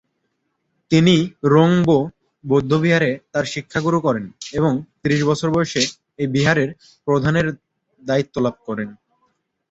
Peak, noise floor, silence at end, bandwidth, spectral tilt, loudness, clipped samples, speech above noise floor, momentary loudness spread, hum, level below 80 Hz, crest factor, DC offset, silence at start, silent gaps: -2 dBFS; -72 dBFS; 0.8 s; 8 kHz; -6 dB/octave; -19 LUFS; under 0.1%; 54 dB; 13 LU; none; -52 dBFS; 18 dB; under 0.1%; 0.9 s; none